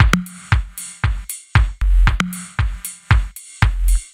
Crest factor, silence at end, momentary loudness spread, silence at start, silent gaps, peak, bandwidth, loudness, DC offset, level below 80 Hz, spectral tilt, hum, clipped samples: 18 dB; 0.1 s; 8 LU; 0 s; none; 0 dBFS; 16 kHz; -20 LUFS; under 0.1%; -18 dBFS; -4.5 dB/octave; none; under 0.1%